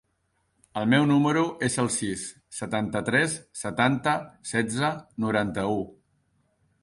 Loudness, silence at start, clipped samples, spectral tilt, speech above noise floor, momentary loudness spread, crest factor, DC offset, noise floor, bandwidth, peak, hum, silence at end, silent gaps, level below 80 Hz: -26 LUFS; 0.75 s; under 0.1%; -4.5 dB/octave; 47 dB; 11 LU; 18 dB; under 0.1%; -73 dBFS; 11.5 kHz; -8 dBFS; none; 0.9 s; none; -58 dBFS